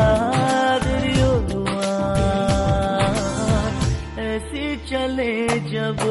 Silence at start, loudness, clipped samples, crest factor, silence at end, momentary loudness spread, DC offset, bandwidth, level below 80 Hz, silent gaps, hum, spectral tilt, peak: 0 s; -21 LUFS; under 0.1%; 14 dB; 0 s; 7 LU; under 0.1%; 11.5 kHz; -30 dBFS; none; none; -5.5 dB/octave; -6 dBFS